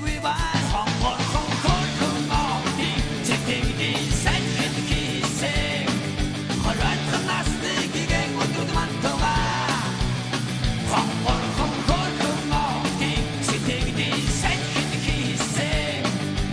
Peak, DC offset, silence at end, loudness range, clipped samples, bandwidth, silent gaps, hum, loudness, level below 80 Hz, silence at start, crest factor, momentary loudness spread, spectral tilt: -6 dBFS; under 0.1%; 0 s; 1 LU; under 0.1%; 11 kHz; none; none; -24 LUFS; -32 dBFS; 0 s; 16 dB; 3 LU; -4 dB/octave